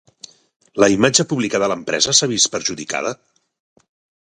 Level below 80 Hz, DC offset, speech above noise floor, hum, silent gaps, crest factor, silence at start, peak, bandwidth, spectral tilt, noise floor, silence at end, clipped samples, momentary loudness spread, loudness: -56 dBFS; under 0.1%; 27 dB; none; none; 20 dB; 0.75 s; 0 dBFS; 11.5 kHz; -2.5 dB/octave; -44 dBFS; 1.1 s; under 0.1%; 11 LU; -17 LUFS